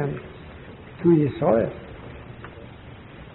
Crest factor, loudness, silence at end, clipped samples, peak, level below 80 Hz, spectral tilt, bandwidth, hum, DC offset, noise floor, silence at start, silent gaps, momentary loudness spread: 20 dB; -22 LUFS; 0.05 s; under 0.1%; -6 dBFS; -50 dBFS; -8.5 dB/octave; 4.1 kHz; none; under 0.1%; -42 dBFS; 0 s; none; 23 LU